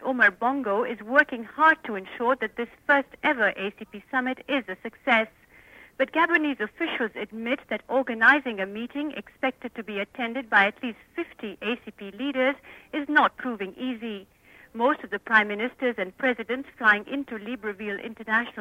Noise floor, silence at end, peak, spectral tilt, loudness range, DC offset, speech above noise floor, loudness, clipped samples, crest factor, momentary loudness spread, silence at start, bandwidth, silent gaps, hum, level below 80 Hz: -52 dBFS; 0 s; -6 dBFS; -5.5 dB/octave; 4 LU; under 0.1%; 26 dB; -25 LUFS; under 0.1%; 22 dB; 13 LU; 0 s; 16 kHz; none; none; -66 dBFS